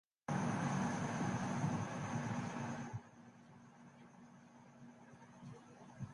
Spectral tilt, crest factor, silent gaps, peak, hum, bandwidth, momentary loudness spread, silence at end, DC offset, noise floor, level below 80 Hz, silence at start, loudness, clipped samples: -6 dB/octave; 18 dB; none; -26 dBFS; none; 11.5 kHz; 22 LU; 0 s; under 0.1%; -61 dBFS; -70 dBFS; 0.3 s; -41 LUFS; under 0.1%